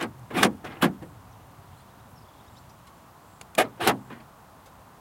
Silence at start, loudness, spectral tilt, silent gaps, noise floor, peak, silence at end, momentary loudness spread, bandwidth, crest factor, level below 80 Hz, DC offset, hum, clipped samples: 0 s; -26 LUFS; -3.5 dB/octave; none; -52 dBFS; -2 dBFS; 0.8 s; 25 LU; 16.5 kHz; 30 dB; -62 dBFS; under 0.1%; none; under 0.1%